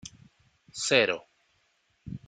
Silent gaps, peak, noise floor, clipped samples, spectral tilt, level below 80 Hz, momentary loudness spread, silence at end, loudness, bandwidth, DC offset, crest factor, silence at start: none; -6 dBFS; -71 dBFS; under 0.1%; -2.5 dB/octave; -64 dBFS; 21 LU; 0.1 s; -26 LUFS; 9.6 kHz; under 0.1%; 26 dB; 0.05 s